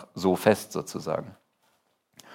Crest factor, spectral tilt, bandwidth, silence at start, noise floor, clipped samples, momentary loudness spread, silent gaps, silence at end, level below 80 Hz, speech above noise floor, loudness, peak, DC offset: 24 dB; -5.5 dB/octave; 16.5 kHz; 0 s; -70 dBFS; under 0.1%; 11 LU; none; 0 s; -70 dBFS; 44 dB; -27 LUFS; -4 dBFS; under 0.1%